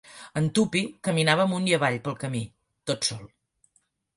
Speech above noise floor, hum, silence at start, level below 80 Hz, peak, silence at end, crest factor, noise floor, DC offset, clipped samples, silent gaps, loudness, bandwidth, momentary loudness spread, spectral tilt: 45 dB; none; 0.1 s; -64 dBFS; -6 dBFS; 0.9 s; 22 dB; -70 dBFS; under 0.1%; under 0.1%; none; -25 LUFS; 11.5 kHz; 12 LU; -4.5 dB/octave